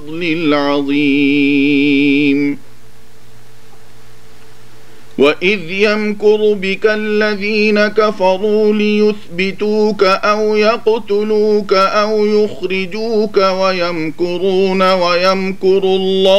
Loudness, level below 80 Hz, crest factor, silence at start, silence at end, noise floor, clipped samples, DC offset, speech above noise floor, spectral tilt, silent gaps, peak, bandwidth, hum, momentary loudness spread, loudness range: -13 LUFS; -56 dBFS; 14 dB; 0 s; 0 s; -44 dBFS; under 0.1%; 5%; 32 dB; -5.5 dB/octave; none; 0 dBFS; 11.5 kHz; none; 5 LU; 5 LU